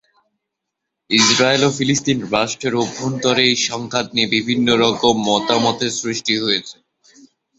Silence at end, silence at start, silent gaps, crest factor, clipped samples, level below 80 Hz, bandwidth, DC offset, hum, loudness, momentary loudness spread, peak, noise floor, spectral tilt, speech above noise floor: 0.85 s; 1.1 s; none; 18 dB; under 0.1%; -56 dBFS; 8.2 kHz; under 0.1%; none; -16 LUFS; 7 LU; -2 dBFS; -79 dBFS; -3 dB/octave; 62 dB